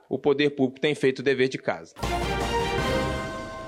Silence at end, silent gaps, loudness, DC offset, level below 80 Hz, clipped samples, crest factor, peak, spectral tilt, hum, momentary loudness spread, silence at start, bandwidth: 0 s; none; -26 LUFS; under 0.1%; -40 dBFS; under 0.1%; 16 dB; -10 dBFS; -5.5 dB/octave; none; 8 LU; 0.1 s; 16 kHz